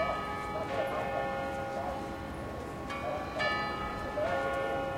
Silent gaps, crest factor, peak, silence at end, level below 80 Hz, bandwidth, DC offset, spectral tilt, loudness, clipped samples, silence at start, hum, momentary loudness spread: none; 16 dB; -18 dBFS; 0 s; -52 dBFS; 16.5 kHz; under 0.1%; -5.5 dB/octave; -35 LUFS; under 0.1%; 0 s; none; 8 LU